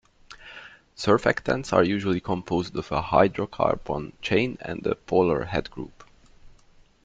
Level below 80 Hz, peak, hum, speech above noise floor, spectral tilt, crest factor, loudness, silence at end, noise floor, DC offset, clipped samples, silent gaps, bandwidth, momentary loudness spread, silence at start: -50 dBFS; -4 dBFS; none; 31 dB; -6.5 dB/octave; 22 dB; -25 LUFS; 0.55 s; -56 dBFS; under 0.1%; under 0.1%; none; 9.2 kHz; 20 LU; 0.3 s